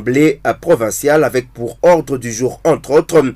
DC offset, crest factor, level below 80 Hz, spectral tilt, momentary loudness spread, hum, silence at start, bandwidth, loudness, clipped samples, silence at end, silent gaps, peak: under 0.1%; 10 dB; -44 dBFS; -5.5 dB/octave; 8 LU; none; 0 s; 16 kHz; -14 LUFS; under 0.1%; 0 s; none; -2 dBFS